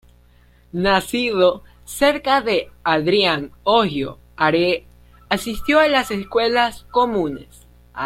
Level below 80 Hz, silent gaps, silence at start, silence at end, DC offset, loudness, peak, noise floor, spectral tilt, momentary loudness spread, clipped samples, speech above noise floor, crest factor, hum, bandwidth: -44 dBFS; none; 0.75 s; 0 s; under 0.1%; -19 LUFS; -2 dBFS; -52 dBFS; -4.5 dB/octave; 11 LU; under 0.1%; 33 dB; 18 dB; 60 Hz at -50 dBFS; 16.5 kHz